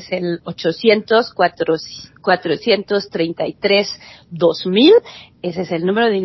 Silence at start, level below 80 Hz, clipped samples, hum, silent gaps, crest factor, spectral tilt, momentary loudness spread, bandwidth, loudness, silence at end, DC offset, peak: 0 s; -58 dBFS; under 0.1%; none; none; 16 dB; -5.5 dB/octave; 12 LU; 6 kHz; -17 LUFS; 0 s; under 0.1%; 0 dBFS